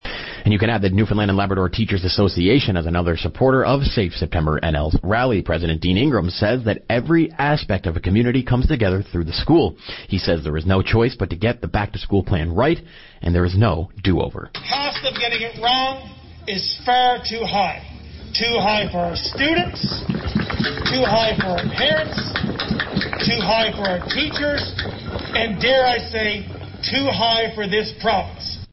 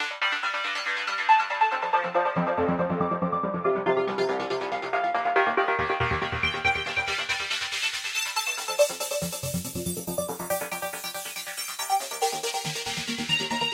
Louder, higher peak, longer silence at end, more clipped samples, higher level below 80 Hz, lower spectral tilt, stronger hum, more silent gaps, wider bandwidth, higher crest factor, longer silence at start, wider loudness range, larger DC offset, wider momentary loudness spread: first, -19 LUFS vs -26 LUFS; about the same, -6 dBFS vs -8 dBFS; about the same, 0.05 s vs 0 s; neither; first, -34 dBFS vs -54 dBFS; first, -8 dB/octave vs -3 dB/octave; neither; neither; second, 6 kHz vs 16 kHz; about the same, 14 dB vs 18 dB; about the same, 0.05 s vs 0 s; second, 2 LU vs 5 LU; neither; about the same, 7 LU vs 7 LU